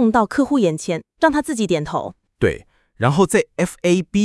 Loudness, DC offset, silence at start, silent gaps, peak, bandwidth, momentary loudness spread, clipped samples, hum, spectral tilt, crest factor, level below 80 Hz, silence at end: -19 LUFS; under 0.1%; 0 s; none; 0 dBFS; 12 kHz; 9 LU; under 0.1%; none; -5.5 dB/octave; 18 dB; -46 dBFS; 0 s